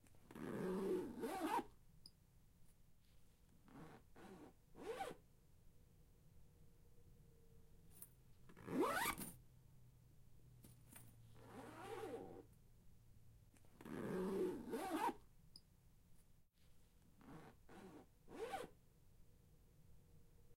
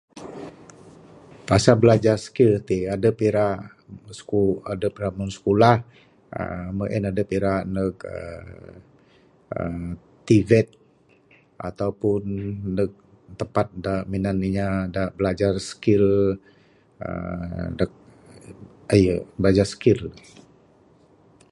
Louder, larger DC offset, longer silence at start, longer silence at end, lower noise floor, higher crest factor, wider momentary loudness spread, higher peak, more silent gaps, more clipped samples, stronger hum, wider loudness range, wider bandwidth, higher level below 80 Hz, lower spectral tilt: second, -47 LUFS vs -22 LUFS; neither; about the same, 0.05 s vs 0.15 s; second, 0 s vs 1.35 s; first, -70 dBFS vs -58 dBFS; about the same, 22 dB vs 22 dB; first, 23 LU vs 18 LU; second, -30 dBFS vs 0 dBFS; neither; neither; neither; first, 12 LU vs 7 LU; first, 16.5 kHz vs 11.5 kHz; second, -72 dBFS vs -44 dBFS; second, -5 dB/octave vs -7 dB/octave